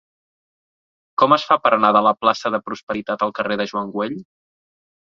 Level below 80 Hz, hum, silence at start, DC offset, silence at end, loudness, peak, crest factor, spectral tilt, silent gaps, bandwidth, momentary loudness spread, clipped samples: -62 dBFS; none; 1.2 s; under 0.1%; 0.8 s; -19 LUFS; 0 dBFS; 20 dB; -5 dB/octave; 2.83-2.87 s; 7.6 kHz; 12 LU; under 0.1%